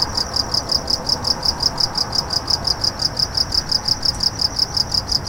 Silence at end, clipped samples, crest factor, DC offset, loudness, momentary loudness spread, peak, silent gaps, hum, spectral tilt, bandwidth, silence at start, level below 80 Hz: 0 s; under 0.1%; 16 dB; under 0.1%; -17 LUFS; 2 LU; -4 dBFS; none; none; -2 dB/octave; 17 kHz; 0 s; -36 dBFS